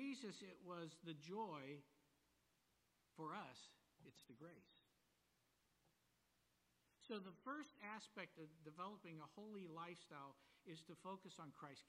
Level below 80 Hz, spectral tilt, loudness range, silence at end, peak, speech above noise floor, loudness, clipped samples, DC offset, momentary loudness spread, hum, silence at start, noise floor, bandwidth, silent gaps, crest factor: under -90 dBFS; -5 dB/octave; 5 LU; 0 s; -38 dBFS; 27 dB; -56 LUFS; under 0.1%; under 0.1%; 11 LU; none; 0 s; -84 dBFS; 13.5 kHz; none; 20 dB